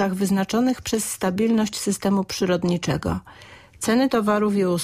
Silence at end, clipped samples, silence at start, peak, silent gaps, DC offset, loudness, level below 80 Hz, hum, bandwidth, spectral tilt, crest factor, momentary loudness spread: 0 s; under 0.1%; 0 s; -10 dBFS; none; under 0.1%; -22 LUFS; -50 dBFS; none; 15.5 kHz; -5 dB/octave; 12 dB; 5 LU